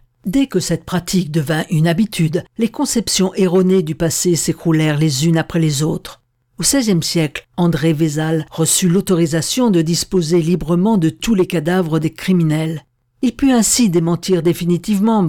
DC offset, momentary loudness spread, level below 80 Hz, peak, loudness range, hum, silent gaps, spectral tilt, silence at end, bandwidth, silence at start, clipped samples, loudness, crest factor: under 0.1%; 6 LU; -42 dBFS; -2 dBFS; 2 LU; none; none; -5 dB/octave; 0 s; 17.5 kHz; 0.25 s; under 0.1%; -16 LUFS; 14 dB